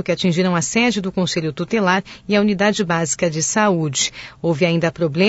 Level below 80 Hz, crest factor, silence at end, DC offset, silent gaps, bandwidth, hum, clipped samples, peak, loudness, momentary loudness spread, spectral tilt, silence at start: -52 dBFS; 14 dB; 0 s; under 0.1%; none; 8 kHz; none; under 0.1%; -4 dBFS; -18 LUFS; 4 LU; -4.5 dB/octave; 0 s